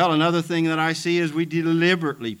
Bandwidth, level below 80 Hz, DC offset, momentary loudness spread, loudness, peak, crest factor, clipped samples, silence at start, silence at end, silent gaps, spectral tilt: 14.5 kHz; -68 dBFS; under 0.1%; 4 LU; -21 LUFS; -6 dBFS; 14 dB; under 0.1%; 0 s; 0.05 s; none; -5.5 dB/octave